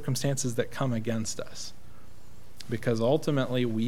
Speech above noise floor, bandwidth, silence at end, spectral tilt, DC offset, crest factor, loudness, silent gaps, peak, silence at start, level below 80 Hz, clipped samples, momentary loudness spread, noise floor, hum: 24 dB; 16.5 kHz; 0 s; -5.5 dB/octave; 2%; 18 dB; -29 LUFS; none; -12 dBFS; 0 s; -58 dBFS; under 0.1%; 14 LU; -53 dBFS; 60 Hz at -55 dBFS